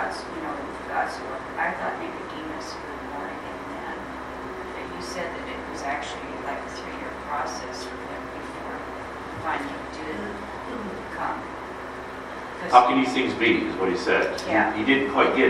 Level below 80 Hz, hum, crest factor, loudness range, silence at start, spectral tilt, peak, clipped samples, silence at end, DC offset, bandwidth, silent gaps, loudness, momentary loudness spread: -50 dBFS; none; 26 dB; 11 LU; 0 s; -4.5 dB/octave; 0 dBFS; under 0.1%; 0 s; under 0.1%; 13.5 kHz; none; -27 LUFS; 14 LU